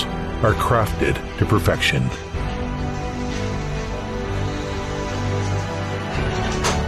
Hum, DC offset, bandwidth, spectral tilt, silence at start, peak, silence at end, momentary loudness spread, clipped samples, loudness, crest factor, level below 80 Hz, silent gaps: none; under 0.1%; 13.5 kHz; -5.5 dB/octave; 0 s; -6 dBFS; 0 s; 8 LU; under 0.1%; -23 LUFS; 16 dB; -30 dBFS; none